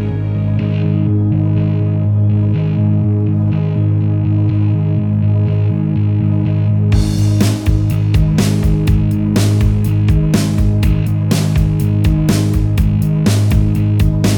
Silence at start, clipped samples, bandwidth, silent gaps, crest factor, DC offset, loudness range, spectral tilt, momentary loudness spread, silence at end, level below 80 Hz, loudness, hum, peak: 0 s; under 0.1%; 17.5 kHz; none; 12 dB; under 0.1%; 1 LU; -7.5 dB/octave; 2 LU; 0 s; -22 dBFS; -14 LUFS; none; 0 dBFS